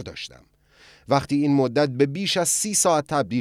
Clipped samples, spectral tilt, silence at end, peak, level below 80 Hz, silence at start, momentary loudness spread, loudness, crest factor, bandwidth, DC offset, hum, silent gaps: under 0.1%; -4 dB/octave; 0 s; -6 dBFS; -58 dBFS; 0 s; 10 LU; -21 LUFS; 18 dB; 15.5 kHz; under 0.1%; none; none